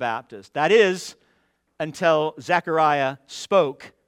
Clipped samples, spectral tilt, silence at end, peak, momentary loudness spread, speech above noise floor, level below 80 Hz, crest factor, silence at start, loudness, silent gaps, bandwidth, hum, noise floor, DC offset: under 0.1%; -4.5 dB/octave; 0.2 s; -4 dBFS; 15 LU; 45 dB; -70 dBFS; 18 dB; 0 s; -21 LUFS; none; 14 kHz; none; -67 dBFS; under 0.1%